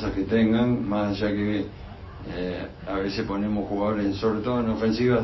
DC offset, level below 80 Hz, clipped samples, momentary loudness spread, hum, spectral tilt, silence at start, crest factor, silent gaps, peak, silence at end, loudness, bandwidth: under 0.1%; -44 dBFS; under 0.1%; 13 LU; none; -8 dB/octave; 0 s; 14 dB; none; -10 dBFS; 0 s; -25 LUFS; 6 kHz